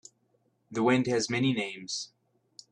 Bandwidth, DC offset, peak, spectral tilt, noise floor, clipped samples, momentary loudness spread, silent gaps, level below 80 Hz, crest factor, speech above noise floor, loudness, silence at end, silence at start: 11 kHz; under 0.1%; -10 dBFS; -4.5 dB/octave; -72 dBFS; under 0.1%; 11 LU; none; -70 dBFS; 20 dB; 44 dB; -29 LUFS; 0.65 s; 0.7 s